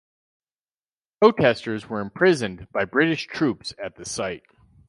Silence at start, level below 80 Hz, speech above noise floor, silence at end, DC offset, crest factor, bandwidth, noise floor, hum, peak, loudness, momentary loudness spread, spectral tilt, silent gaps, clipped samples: 1.2 s; -58 dBFS; over 68 dB; 0.5 s; under 0.1%; 20 dB; 11.5 kHz; under -90 dBFS; none; -4 dBFS; -22 LUFS; 13 LU; -5 dB/octave; none; under 0.1%